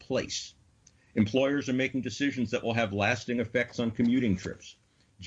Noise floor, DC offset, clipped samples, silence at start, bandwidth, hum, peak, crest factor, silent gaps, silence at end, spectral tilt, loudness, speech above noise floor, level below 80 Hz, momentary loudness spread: -62 dBFS; under 0.1%; under 0.1%; 0.1 s; 8 kHz; none; -14 dBFS; 16 dB; none; 0 s; -5.5 dB/octave; -29 LUFS; 33 dB; -60 dBFS; 10 LU